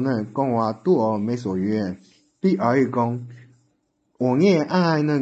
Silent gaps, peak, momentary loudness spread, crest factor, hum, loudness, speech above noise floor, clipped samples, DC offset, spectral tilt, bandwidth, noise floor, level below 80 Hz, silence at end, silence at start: none; -6 dBFS; 8 LU; 16 dB; none; -21 LUFS; 48 dB; under 0.1%; under 0.1%; -8 dB/octave; 8 kHz; -69 dBFS; -60 dBFS; 0 s; 0 s